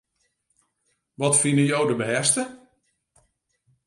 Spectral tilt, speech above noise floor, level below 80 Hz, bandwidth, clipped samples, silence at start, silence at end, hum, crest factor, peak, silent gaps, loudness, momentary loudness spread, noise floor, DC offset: -3.5 dB/octave; 52 dB; -70 dBFS; 11.5 kHz; under 0.1%; 1.2 s; 1.3 s; none; 20 dB; -6 dBFS; none; -21 LUFS; 8 LU; -73 dBFS; under 0.1%